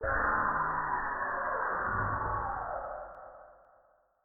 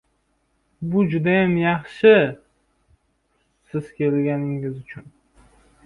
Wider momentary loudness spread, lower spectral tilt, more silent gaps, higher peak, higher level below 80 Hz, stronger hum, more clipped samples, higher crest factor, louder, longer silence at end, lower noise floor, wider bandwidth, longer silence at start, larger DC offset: second, 14 LU vs 20 LU; second, 0.5 dB/octave vs -8.5 dB/octave; neither; second, -18 dBFS vs -4 dBFS; first, -50 dBFS vs -56 dBFS; neither; neither; about the same, 16 dB vs 20 dB; second, -32 LUFS vs -20 LUFS; second, 0.7 s vs 0.85 s; about the same, -67 dBFS vs -68 dBFS; second, 2.2 kHz vs 5 kHz; second, 0 s vs 0.8 s; neither